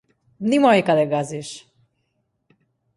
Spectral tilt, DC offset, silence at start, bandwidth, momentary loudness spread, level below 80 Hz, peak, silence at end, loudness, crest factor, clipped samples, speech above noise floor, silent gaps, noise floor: -5.5 dB/octave; under 0.1%; 0.4 s; 11.5 kHz; 19 LU; -66 dBFS; -4 dBFS; 1.4 s; -19 LUFS; 18 dB; under 0.1%; 53 dB; none; -72 dBFS